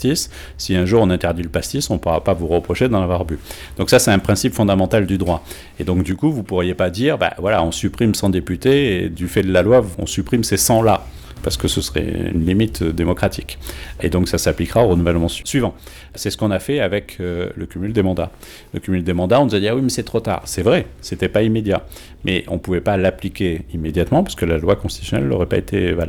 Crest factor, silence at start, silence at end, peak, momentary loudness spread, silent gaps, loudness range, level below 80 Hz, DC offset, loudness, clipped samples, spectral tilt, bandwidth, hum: 16 dB; 0 s; 0 s; -2 dBFS; 10 LU; none; 3 LU; -34 dBFS; under 0.1%; -18 LUFS; under 0.1%; -5.5 dB/octave; 20 kHz; none